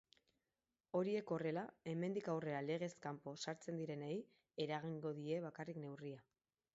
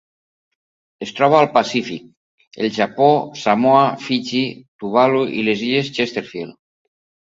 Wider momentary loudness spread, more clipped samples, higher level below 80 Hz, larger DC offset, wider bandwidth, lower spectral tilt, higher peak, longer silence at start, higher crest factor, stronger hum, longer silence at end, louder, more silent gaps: second, 8 LU vs 17 LU; neither; second, -86 dBFS vs -64 dBFS; neither; about the same, 7.6 kHz vs 7.8 kHz; about the same, -5.5 dB/octave vs -5.5 dB/octave; second, -28 dBFS vs 0 dBFS; about the same, 0.95 s vs 1 s; about the same, 18 dB vs 18 dB; neither; second, 0.55 s vs 0.85 s; second, -46 LUFS vs -17 LUFS; second, none vs 2.17-2.38 s, 2.47-2.51 s, 4.68-4.79 s